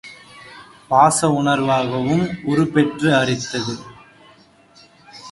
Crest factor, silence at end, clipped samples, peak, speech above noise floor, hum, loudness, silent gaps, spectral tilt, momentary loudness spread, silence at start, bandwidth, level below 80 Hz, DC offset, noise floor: 20 dB; 0 s; under 0.1%; 0 dBFS; 33 dB; none; -18 LUFS; none; -5 dB/octave; 25 LU; 0.05 s; 11.5 kHz; -54 dBFS; under 0.1%; -50 dBFS